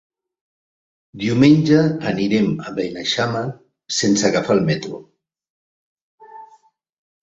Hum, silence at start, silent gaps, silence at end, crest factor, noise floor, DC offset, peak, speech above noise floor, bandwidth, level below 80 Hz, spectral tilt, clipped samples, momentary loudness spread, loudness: none; 1.15 s; 5.50-6.18 s; 0.8 s; 20 dB; -55 dBFS; under 0.1%; -2 dBFS; 38 dB; 8 kHz; -56 dBFS; -5 dB/octave; under 0.1%; 13 LU; -18 LUFS